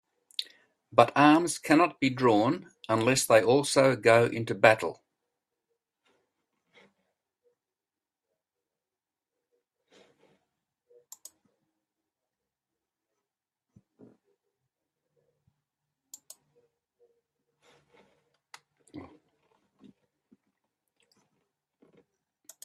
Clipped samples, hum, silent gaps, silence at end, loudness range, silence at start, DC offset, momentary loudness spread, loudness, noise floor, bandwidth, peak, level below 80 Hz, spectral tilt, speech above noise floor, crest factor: under 0.1%; none; none; 3.6 s; 7 LU; 0.4 s; under 0.1%; 16 LU; -24 LUFS; under -90 dBFS; 14 kHz; -4 dBFS; -74 dBFS; -4.5 dB/octave; over 66 dB; 28 dB